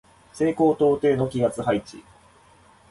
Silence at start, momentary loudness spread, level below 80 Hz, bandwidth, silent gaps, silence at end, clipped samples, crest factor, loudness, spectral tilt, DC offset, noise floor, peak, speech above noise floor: 0.35 s; 7 LU; -56 dBFS; 11.5 kHz; none; 0.9 s; under 0.1%; 16 dB; -22 LUFS; -7 dB/octave; under 0.1%; -54 dBFS; -8 dBFS; 33 dB